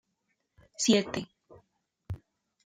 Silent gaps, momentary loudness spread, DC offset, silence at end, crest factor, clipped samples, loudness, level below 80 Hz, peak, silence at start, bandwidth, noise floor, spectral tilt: none; 22 LU; under 0.1%; 0.5 s; 24 dB; under 0.1%; -28 LUFS; -62 dBFS; -10 dBFS; 0.8 s; 14.5 kHz; -79 dBFS; -3.5 dB/octave